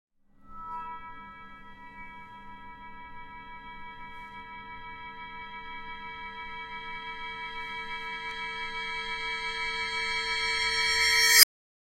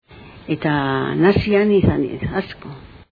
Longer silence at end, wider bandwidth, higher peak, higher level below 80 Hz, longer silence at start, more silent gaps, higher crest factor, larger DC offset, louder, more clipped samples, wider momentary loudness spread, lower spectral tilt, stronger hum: first, 0.55 s vs 0.15 s; first, 16 kHz vs 5 kHz; about the same, 0 dBFS vs 0 dBFS; second, -54 dBFS vs -38 dBFS; first, 0.4 s vs 0.1 s; neither; first, 32 dB vs 18 dB; neither; second, -26 LUFS vs -18 LUFS; neither; first, 24 LU vs 19 LU; second, 1.5 dB/octave vs -9.5 dB/octave; neither